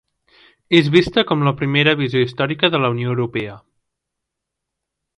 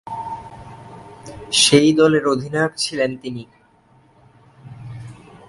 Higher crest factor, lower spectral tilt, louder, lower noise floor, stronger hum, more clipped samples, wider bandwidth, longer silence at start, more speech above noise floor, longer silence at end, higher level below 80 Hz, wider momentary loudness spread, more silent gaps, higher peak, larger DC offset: about the same, 18 dB vs 20 dB; first, -7 dB/octave vs -3.5 dB/octave; about the same, -17 LUFS vs -17 LUFS; first, -80 dBFS vs -54 dBFS; neither; neither; about the same, 11.5 kHz vs 11.5 kHz; first, 0.7 s vs 0.05 s; first, 64 dB vs 37 dB; first, 1.6 s vs 0.35 s; about the same, -52 dBFS vs -54 dBFS; second, 8 LU vs 26 LU; neither; about the same, 0 dBFS vs 0 dBFS; neither